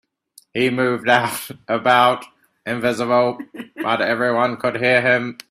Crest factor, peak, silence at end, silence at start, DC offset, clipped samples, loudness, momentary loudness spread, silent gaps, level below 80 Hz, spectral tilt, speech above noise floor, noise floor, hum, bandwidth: 20 dB; 0 dBFS; 0.15 s; 0.55 s; under 0.1%; under 0.1%; -18 LUFS; 13 LU; none; -62 dBFS; -4.5 dB/octave; 34 dB; -53 dBFS; none; 16 kHz